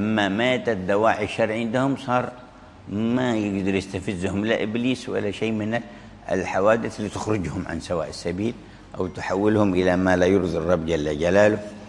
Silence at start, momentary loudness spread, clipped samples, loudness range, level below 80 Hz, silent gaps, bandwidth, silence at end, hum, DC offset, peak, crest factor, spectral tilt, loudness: 0 s; 10 LU; under 0.1%; 4 LU; -50 dBFS; none; 11.5 kHz; 0 s; none; under 0.1%; -4 dBFS; 20 dB; -6 dB/octave; -23 LUFS